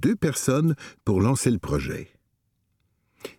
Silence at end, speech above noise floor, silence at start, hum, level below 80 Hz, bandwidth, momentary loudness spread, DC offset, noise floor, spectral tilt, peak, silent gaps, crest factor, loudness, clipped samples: 0.1 s; 49 dB; 0 s; none; -46 dBFS; 17 kHz; 11 LU; under 0.1%; -72 dBFS; -6 dB/octave; -6 dBFS; none; 18 dB; -24 LUFS; under 0.1%